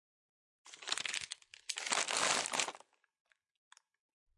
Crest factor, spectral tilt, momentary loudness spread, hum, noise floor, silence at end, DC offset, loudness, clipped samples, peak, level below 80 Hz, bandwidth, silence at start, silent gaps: 28 dB; 1 dB/octave; 16 LU; none; -61 dBFS; 1.6 s; under 0.1%; -36 LUFS; under 0.1%; -14 dBFS; -86 dBFS; 11.5 kHz; 0.65 s; none